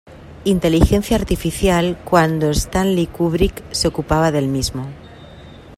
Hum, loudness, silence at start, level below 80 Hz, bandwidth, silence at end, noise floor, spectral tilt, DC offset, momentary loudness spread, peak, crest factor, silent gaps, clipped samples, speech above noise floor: none; -17 LUFS; 0.1 s; -28 dBFS; 16 kHz; 0 s; -39 dBFS; -5.5 dB/octave; under 0.1%; 7 LU; 0 dBFS; 18 dB; none; under 0.1%; 22 dB